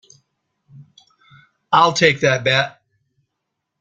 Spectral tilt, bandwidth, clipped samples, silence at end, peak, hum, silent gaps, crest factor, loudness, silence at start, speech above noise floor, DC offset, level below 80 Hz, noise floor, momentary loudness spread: -4 dB/octave; 9.2 kHz; under 0.1%; 1.1 s; 0 dBFS; none; none; 20 dB; -16 LUFS; 0.8 s; 63 dB; under 0.1%; -58 dBFS; -78 dBFS; 5 LU